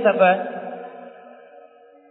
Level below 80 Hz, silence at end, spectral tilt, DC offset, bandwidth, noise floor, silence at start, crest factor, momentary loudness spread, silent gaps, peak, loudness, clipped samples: -84 dBFS; 0.9 s; -9.5 dB/octave; under 0.1%; 4 kHz; -49 dBFS; 0 s; 20 dB; 24 LU; none; -2 dBFS; -20 LUFS; under 0.1%